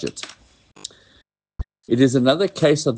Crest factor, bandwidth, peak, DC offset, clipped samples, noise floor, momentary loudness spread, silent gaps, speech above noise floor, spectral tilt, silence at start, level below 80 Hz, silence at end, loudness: 18 dB; 9.8 kHz; -4 dBFS; under 0.1%; under 0.1%; -59 dBFS; 21 LU; none; 40 dB; -5.5 dB/octave; 0 s; -44 dBFS; 0 s; -18 LUFS